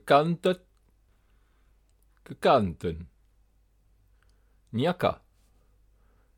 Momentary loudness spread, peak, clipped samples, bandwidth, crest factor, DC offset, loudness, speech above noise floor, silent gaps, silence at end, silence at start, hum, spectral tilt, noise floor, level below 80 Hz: 21 LU; -6 dBFS; under 0.1%; 17 kHz; 24 dB; under 0.1%; -27 LUFS; 40 dB; none; 1.25 s; 0.05 s; none; -6.5 dB/octave; -65 dBFS; -56 dBFS